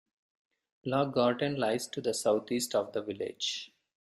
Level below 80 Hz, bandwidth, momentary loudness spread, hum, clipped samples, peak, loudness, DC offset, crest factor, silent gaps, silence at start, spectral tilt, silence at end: -74 dBFS; 15 kHz; 10 LU; none; under 0.1%; -14 dBFS; -31 LUFS; under 0.1%; 18 dB; none; 0.85 s; -4 dB/octave; 0.45 s